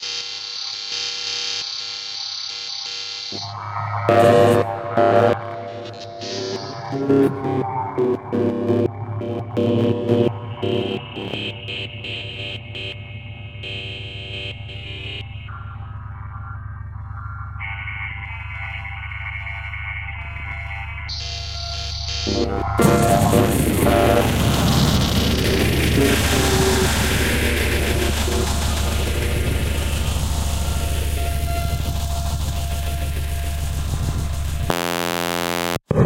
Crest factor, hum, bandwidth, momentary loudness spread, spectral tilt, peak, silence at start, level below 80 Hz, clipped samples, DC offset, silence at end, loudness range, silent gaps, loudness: 20 dB; none; 17 kHz; 14 LU; -5 dB/octave; 0 dBFS; 0 s; -28 dBFS; under 0.1%; under 0.1%; 0 s; 13 LU; none; -21 LUFS